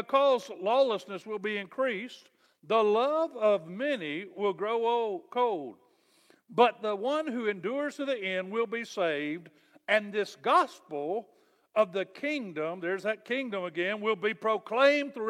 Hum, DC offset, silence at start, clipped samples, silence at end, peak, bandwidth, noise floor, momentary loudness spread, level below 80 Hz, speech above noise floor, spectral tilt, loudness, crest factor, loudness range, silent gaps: none; under 0.1%; 0 s; under 0.1%; 0 s; -8 dBFS; 12.5 kHz; -64 dBFS; 10 LU; -86 dBFS; 35 dB; -5 dB/octave; -30 LUFS; 20 dB; 3 LU; none